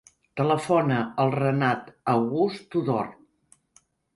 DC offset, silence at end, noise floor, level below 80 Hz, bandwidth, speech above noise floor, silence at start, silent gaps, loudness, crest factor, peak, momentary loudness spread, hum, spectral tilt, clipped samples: under 0.1%; 1.05 s; -63 dBFS; -66 dBFS; 11.5 kHz; 39 dB; 0.35 s; none; -25 LUFS; 18 dB; -8 dBFS; 7 LU; none; -7.5 dB/octave; under 0.1%